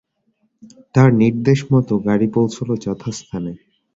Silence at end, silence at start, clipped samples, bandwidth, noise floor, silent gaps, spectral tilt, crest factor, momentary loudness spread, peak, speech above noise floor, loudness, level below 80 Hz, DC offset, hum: 0.4 s; 0.95 s; under 0.1%; 7.8 kHz; -66 dBFS; none; -7.5 dB/octave; 16 dB; 14 LU; -2 dBFS; 49 dB; -17 LUFS; -50 dBFS; under 0.1%; none